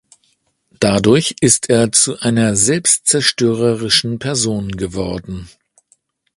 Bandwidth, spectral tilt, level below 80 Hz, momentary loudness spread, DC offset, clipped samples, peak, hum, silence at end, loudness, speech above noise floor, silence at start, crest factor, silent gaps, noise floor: 11.5 kHz; -3.5 dB/octave; -44 dBFS; 11 LU; under 0.1%; under 0.1%; 0 dBFS; none; 0.9 s; -14 LUFS; 47 dB; 0.8 s; 16 dB; none; -62 dBFS